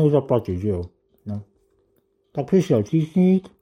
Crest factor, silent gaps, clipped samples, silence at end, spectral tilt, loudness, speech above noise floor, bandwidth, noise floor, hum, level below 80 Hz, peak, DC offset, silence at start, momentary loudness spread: 16 dB; none; under 0.1%; 0.15 s; -9 dB/octave; -21 LUFS; 46 dB; 8.6 kHz; -66 dBFS; none; -56 dBFS; -6 dBFS; under 0.1%; 0 s; 16 LU